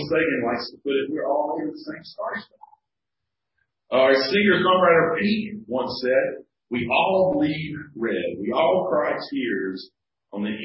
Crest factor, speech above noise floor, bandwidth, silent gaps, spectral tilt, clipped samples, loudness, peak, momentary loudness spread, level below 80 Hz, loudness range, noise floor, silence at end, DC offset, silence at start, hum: 18 dB; 63 dB; 5.8 kHz; none; -9.5 dB/octave; under 0.1%; -22 LUFS; -6 dBFS; 14 LU; -58 dBFS; 7 LU; -85 dBFS; 0 s; under 0.1%; 0 s; none